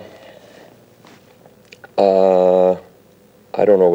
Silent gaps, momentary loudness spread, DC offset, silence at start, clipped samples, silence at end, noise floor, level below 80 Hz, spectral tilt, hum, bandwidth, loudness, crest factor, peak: none; 13 LU; under 0.1%; 0 s; under 0.1%; 0 s; -49 dBFS; -66 dBFS; -8 dB/octave; none; 16.5 kHz; -15 LUFS; 16 dB; 0 dBFS